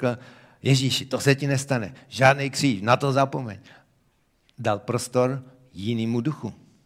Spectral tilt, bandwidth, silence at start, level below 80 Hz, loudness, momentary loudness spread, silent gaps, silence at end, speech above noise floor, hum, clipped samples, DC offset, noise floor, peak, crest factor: -5 dB/octave; 15.5 kHz; 0 s; -64 dBFS; -24 LUFS; 15 LU; none; 0.3 s; 42 dB; none; under 0.1%; under 0.1%; -66 dBFS; -2 dBFS; 22 dB